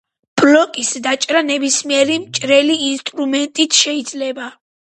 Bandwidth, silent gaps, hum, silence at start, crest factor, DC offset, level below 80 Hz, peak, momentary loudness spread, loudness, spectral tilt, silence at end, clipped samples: 11.5 kHz; none; none; 0.35 s; 16 dB; under 0.1%; -64 dBFS; 0 dBFS; 11 LU; -15 LUFS; -1.5 dB/octave; 0.45 s; under 0.1%